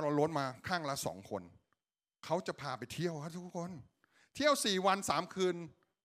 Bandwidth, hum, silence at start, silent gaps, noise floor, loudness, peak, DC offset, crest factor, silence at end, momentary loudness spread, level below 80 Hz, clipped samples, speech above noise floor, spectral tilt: 15.5 kHz; none; 0 s; none; under -90 dBFS; -36 LUFS; -16 dBFS; under 0.1%; 20 dB; 0.35 s; 15 LU; -74 dBFS; under 0.1%; over 54 dB; -4 dB/octave